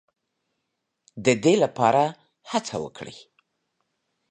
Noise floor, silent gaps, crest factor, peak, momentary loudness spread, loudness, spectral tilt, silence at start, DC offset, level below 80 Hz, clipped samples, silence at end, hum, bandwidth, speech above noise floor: -79 dBFS; none; 22 dB; -4 dBFS; 17 LU; -23 LUFS; -5 dB/octave; 1.15 s; under 0.1%; -68 dBFS; under 0.1%; 1.15 s; none; 10 kHz; 57 dB